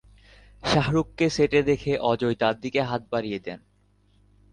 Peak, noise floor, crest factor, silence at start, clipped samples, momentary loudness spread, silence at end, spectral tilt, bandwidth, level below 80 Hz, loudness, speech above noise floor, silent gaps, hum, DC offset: -8 dBFS; -62 dBFS; 18 dB; 0.65 s; under 0.1%; 11 LU; 0.95 s; -6 dB/octave; 10.5 kHz; -50 dBFS; -25 LUFS; 38 dB; none; 50 Hz at -50 dBFS; under 0.1%